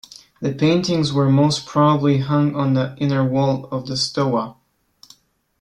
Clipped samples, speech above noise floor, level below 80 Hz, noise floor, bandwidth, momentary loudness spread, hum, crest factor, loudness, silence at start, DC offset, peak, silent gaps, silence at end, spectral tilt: under 0.1%; 36 dB; -56 dBFS; -53 dBFS; 10.5 kHz; 9 LU; none; 16 dB; -19 LUFS; 0.4 s; under 0.1%; -4 dBFS; none; 1.1 s; -6.5 dB/octave